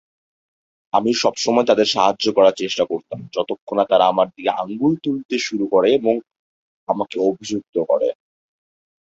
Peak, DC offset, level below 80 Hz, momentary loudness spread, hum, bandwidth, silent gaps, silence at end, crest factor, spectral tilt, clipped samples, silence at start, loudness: -2 dBFS; under 0.1%; -62 dBFS; 9 LU; none; 8 kHz; 3.61-3.67 s, 5.25-5.29 s, 6.39-6.87 s, 7.69-7.73 s; 0.9 s; 18 dB; -4.5 dB/octave; under 0.1%; 0.95 s; -19 LUFS